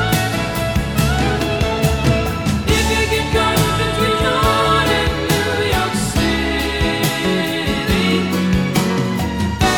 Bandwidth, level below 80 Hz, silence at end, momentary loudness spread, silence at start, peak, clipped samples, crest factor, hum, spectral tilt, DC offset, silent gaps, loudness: over 20 kHz; -26 dBFS; 0 s; 4 LU; 0 s; -2 dBFS; under 0.1%; 14 dB; none; -5 dB/octave; 0.4%; none; -17 LUFS